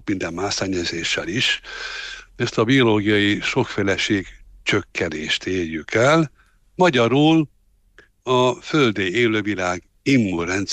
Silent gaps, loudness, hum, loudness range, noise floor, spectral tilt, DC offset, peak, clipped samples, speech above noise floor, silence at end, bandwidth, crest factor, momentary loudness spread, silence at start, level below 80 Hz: none; -20 LUFS; none; 2 LU; -54 dBFS; -5 dB/octave; under 0.1%; -6 dBFS; under 0.1%; 34 dB; 0 s; 9.4 kHz; 14 dB; 11 LU; 0.05 s; -50 dBFS